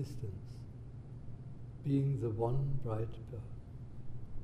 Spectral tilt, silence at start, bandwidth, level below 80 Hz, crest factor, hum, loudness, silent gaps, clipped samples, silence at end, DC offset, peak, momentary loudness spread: -10 dB/octave; 0 s; 8.6 kHz; -50 dBFS; 18 dB; none; -39 LUFS; none; under 0.1%; 0 s; under 0.1%; -20 dBFS; 16 LU